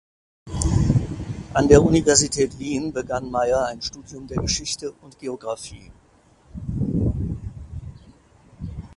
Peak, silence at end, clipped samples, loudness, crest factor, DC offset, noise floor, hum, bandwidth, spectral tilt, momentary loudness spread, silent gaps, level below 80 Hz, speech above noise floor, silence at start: 0 dBFS; 0.05 s; under 0.1%; -22 LUFS; 24 dB; under 0.1%; -54 dBFS; none; 11.5 kHz; -5 dB/octave; 21 LU; none; -34 dBFS; 33 dB; 0.45 s